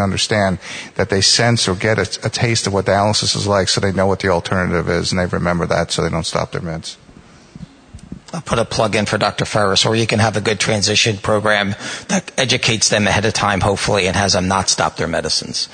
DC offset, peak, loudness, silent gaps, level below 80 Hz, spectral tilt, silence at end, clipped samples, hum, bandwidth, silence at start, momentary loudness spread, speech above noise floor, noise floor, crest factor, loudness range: under 0.1%; 0 dBFS; -16 LUFS; none; -42 dBFS; -3.5 dB/octave; 0 s; under 0.1%; none; 9.6 kHz; 0 s; 8 LU; 26 dB; -43 dBFS; 16 dB; 6 LU